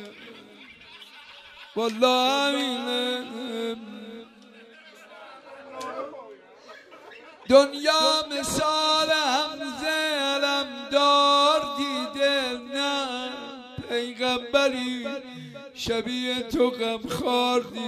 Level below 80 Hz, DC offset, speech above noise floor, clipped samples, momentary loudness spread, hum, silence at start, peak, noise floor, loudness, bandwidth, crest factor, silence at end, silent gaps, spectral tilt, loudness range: -60 dBFS; under 0.1%; 26 dB; under 0.1%; 24 LU; none; 0 s; -4 dBFS; -50 dBFS; -24 LUFS; 15.5 kHz; 22 dB; 0 s; none; -2.5 dB/octave; 13 LU